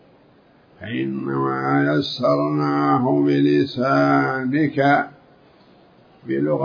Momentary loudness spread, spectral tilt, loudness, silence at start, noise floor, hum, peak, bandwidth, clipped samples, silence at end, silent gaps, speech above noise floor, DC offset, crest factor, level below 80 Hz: 9 LU; -8 dB/octave; -19 LUFS; 0.8 s; -53 dBFS; none; -6 dBFS; 5.2 kHz; under 0.1%; 0 s; none; 34 dB; under 0.1%; 14 dB; -66 dBFS